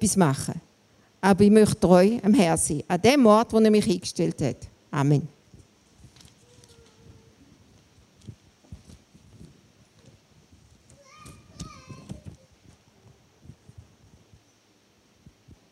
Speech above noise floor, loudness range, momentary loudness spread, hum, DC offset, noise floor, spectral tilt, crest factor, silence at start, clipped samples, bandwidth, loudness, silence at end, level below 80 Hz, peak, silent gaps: 42 dB; 13 LU; 25 LU; none; under 0.1%; -62 dBFS; -5.5 dB/octave; 22 dB; 0 s; under 0.1%; 13.5 kHz; -21 LUFS; 3.4 s; -54 dBFS; -4 dBFS; none